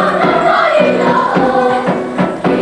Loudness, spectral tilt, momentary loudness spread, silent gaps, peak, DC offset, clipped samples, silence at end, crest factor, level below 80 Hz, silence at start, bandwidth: -12 LUFS; -6.5 dB/octave; 5 LU; none; 0 dBFS; under 0.1%; under 0.1%; 0 s; 12 dB; -46 dBFS; 0 s; 11 kHz